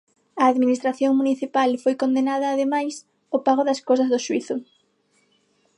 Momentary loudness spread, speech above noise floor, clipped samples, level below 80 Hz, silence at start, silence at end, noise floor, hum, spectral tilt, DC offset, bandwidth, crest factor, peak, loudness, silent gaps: 9 LU; 44 dB; under 0.1%; -78 dBFS; 0.35 s; 1.15 s; -65 dBFS; 50 Hz at -70 dBFS; -4 dB/octave; under 0.1%; 11 kHz; 16 dB; -6 dBFS; -22 LUFS; none